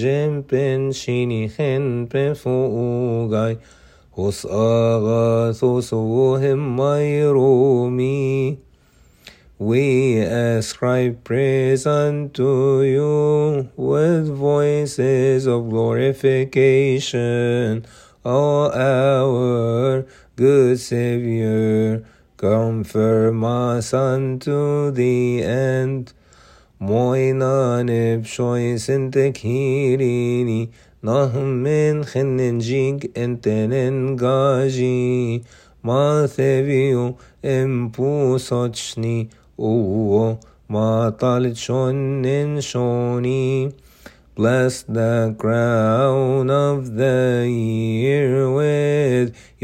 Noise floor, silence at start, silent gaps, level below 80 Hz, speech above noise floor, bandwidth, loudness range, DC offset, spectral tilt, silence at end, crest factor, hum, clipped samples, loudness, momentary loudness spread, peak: -53 dBFS; 0 s; none; -54 dBFS; 35 dB; 14 kHz; 3 LU; under 0.1%; -7 dB/octave; 0.3 s; 14 dB; none; under 0.1%; -19 LUFS; 6 LU; -4 dBFS